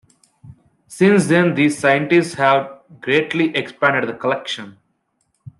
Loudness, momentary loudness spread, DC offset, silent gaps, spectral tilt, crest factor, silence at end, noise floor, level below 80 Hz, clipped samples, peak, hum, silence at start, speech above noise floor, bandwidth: -17 LUFS; 10 LU; under 0.1%; none; -5.5 dB/octave; 16 dB; 0.1 s; -68 dBFS; -62 dBFS; under 0.1%; -2 dBFS; none; 0.45 s; 51 dB; 12.5 kHz